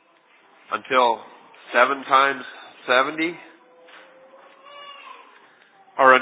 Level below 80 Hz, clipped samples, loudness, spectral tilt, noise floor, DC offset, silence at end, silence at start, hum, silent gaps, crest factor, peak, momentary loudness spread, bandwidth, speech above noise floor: -86 dBFS; under 0.1%; -20 LUFS; -6.5 dB/octave; -57 dBFS; under 0.1%; 0 s; 0.7 s; none; none; 22 dB; -2 dBFS; 23 LU; 4 kHz; 36 dB